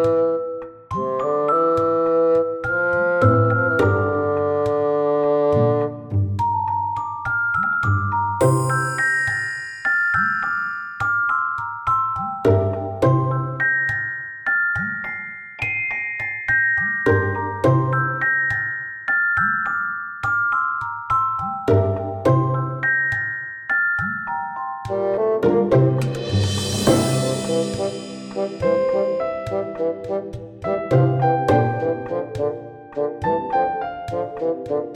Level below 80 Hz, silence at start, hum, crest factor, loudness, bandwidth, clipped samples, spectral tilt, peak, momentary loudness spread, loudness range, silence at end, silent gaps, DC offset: -52 dBFS; 0 s; none; 18 dB; -20 LUFS; 18.5 kHz; under 0.1%; -6 dB/octave; -2 dBFS; 9 LU; 3 LU; 0 s; none; under 0.1%